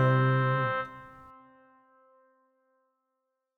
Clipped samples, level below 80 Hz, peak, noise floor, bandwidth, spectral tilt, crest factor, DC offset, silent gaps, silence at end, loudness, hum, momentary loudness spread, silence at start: under 0.1%; -70 dBFS; -14 dBFS; -82 dBFS; 4.4 kHz; -9 dB/octave; 18 dB; under 0.1%; none; 2.5 s; -27 LUFS; none; 24 LU; 0 s